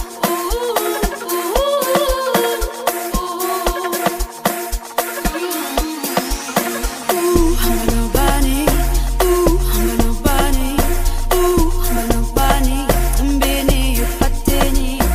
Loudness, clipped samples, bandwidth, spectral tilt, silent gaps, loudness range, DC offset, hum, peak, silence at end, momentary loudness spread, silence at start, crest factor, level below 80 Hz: -18 LUFS; under 0.1%; 16 kHz; -4.5 dB/octave; none; 4 LU; under 0.1%; none; 0 dBFS; 0 s; 5 LU; 0 s; 16 dB; -20 dBFS